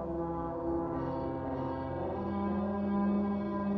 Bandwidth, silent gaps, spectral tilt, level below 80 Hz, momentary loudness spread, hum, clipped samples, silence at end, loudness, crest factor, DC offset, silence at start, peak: 4.8 kHz; none; -10.5 dB/octave; -52 dBFS; 5 LU; none; under 0.1%; 0 s; -34 LUFS; 12 dB; under 0.1%; 0 s; -22 dBFS